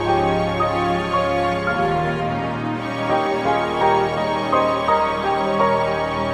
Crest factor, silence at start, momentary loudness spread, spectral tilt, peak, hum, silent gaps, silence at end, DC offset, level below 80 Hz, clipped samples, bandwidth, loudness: 16 dB; 0 s; 5 LU; -6.5 dB/octave; -4 dBFS; none; none; 0 s; under 0.1%; -42 dBFS; under 0.1%; 13 kHz; -20 LUFS